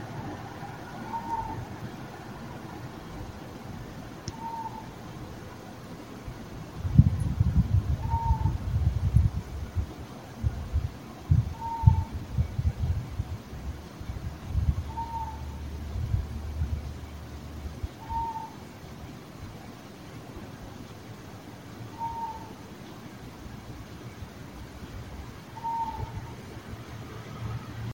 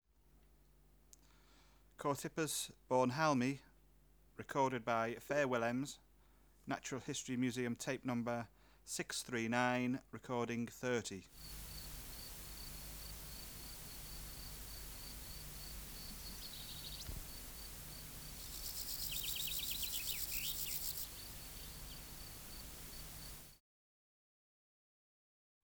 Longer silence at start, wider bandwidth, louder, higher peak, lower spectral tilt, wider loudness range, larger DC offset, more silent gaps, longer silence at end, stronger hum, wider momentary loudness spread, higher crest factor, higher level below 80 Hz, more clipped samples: second, 0 s vs 0.35 s; second, 16.5 kHz vs over 20 kHz; first, -33 LUFS vs -42 LUFS; first, -4 dBFS vs -20 dBFS; first, -7.5 dB/octave vs -3.5 dB/octave; first, 13 LU vs 10 LU; neither; neither; second, 0 s vs 2.05 s; neither; first, 17 LU vs 13 LU; about the same, 28 dB vs 24 dB; first, -38 dBFS vs -58 dBFS; neither